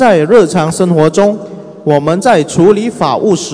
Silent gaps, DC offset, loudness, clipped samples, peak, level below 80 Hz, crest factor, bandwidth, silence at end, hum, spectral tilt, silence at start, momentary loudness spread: none; under 0.1%; -10 LUFS; 3%; 0 dBFS; -46 dBFS; 10 dB; 11 kHz; 0 s; none; -6 dB/octave; 0 s; 6 LU